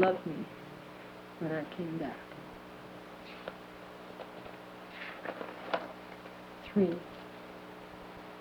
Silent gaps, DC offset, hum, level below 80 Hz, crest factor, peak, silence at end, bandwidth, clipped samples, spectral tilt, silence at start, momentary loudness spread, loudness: none; under 0.1%; 60 Hz at -70 dBFS; -68 dBFS; 28 dB; -10 dBFS; 0 s; over 20 kHz; under 0.1%; -7 dB/octave; 0 s; 15 LU; -40 LUFS